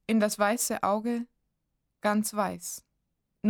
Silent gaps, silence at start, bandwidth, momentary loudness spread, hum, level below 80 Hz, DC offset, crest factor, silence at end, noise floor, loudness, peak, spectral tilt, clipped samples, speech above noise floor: none; 0.1 s; over 20 kHz; 12 LU; none; -70 dBFS; under 0.1%; 20 dB; 0 s; -80 dBFS; -29 LUFS; -10 dBFS; -4 dB/octave; under 0.1%; 52 dB